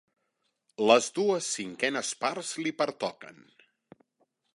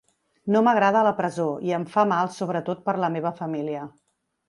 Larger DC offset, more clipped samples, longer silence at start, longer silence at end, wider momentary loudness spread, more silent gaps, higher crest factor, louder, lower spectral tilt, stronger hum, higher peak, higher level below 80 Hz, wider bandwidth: neither; neither; first, 0.8 s vs 0.45 s; first, 1.25 s vs 0.6 s; first, 15 LU vs 12 LU; neither; first, 24 dB vs 18 dB; second, -28 LUFS vs -23 LUFS; second, -2.5 dB/octave vs -6.5 dB/octave; neither; about the same, -6 dBFS vs -6 dBFS; second, -80 dBFS vs -72 dBFS; about the same, 11.5 kHz vs 11.5 kHz